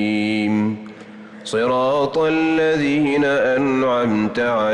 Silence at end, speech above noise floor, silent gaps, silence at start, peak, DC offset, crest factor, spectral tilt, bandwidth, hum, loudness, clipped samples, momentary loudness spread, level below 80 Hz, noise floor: 0 s; 21 dB; none; 0 s; -10 dBFS; under 0.1%; 8 dB; -6 dB/octave; 10.5 kHz; none; -18 LUFS; under 0.1%; 12 LU; -54 dBFS; -38 dBFS